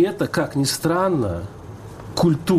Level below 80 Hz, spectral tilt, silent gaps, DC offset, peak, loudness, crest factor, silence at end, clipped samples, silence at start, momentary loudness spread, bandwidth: -46 dBFS; -5.5 dB/octave; none; under 0.1%; -8 dBFS; -21 LUFS; 14 dB; 0 s; under 0.1%; 0 s; 18 LU; 15.5 kHz